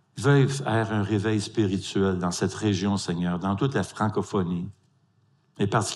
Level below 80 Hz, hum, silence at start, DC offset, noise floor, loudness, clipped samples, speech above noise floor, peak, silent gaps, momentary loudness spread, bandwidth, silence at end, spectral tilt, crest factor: -64 dBFS; none; 0.15 s; under 0.1%; -65 dBFS; -26 LUFS; under 0.1%; 40 dB; -8 dBFS; none; 6 LU; 12 kHz; 0 s; -6 dB/octave; 18 dB